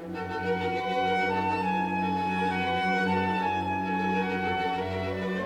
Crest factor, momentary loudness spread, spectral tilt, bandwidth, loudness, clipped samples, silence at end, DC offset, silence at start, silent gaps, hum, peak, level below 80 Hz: 12 dB; 5 LU; -6.5 dB/octave; 10.5 kHz; -28 LUFS; under 0.1%; 0 s; under 0.1%; 0 s; none; none; -16 dBFS; -64 dBFS